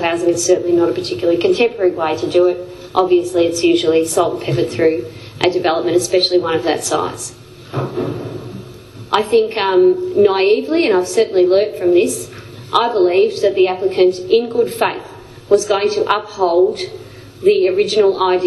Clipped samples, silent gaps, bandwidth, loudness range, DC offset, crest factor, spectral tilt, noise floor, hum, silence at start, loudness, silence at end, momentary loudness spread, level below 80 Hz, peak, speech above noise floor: under 0.1%; none; 12.5 kHz; 4 LU; under 0.1%; 16 dB; -4.5 dB/octave; -35 dBFS; none; 0 s; -15 LUFS; 0 s; 11 LU; -54 dBFS; 0 dBFS; 20 dB